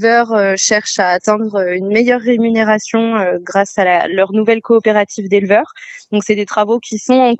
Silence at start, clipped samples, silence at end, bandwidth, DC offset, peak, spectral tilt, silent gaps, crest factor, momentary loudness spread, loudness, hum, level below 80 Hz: 0 s; under 0.1%; 0 s; 8.4 kHz; under 0.1%; 0 dBFS; -4 dB/octave; none; 12 dB; 4 LU; -13 LUFS; none; -60 dBFS